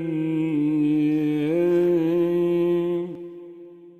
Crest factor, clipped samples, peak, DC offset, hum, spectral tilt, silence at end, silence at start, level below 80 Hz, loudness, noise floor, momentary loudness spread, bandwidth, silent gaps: 10 dB; under 0.1%; -12 dBFS; under 0.1%; none; -9 dB/octave; 0.1 s; 0 s; -70 dBFS; -22 LUFS; -44 dBFS; 16 LU; 4.3 kHz; none